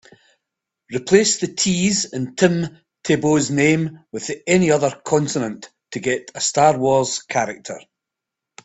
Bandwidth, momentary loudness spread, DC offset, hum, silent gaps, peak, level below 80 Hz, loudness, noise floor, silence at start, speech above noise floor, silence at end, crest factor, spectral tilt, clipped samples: 8.4 kHz; 14 LU; under 0.1%; none; none; 0 dBFS; -56 dBFS; -19 LUFS; -84 dBFS; 0.9 s; 65 dB; 0.85 s; 20 dB; -4 dB/octave; under 0.1%